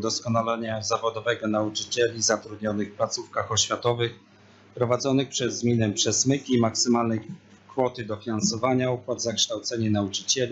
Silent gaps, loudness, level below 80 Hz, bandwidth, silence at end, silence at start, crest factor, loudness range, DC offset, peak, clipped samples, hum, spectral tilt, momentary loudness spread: none; -25 LUFS; -64 dBFS; 8.2 kHz; 0 s; 0 s; 16 dB; 2 LU; under 0.1%; -10 dBFS; under 0.1%; none; -3.5 dB/octave; 7 LU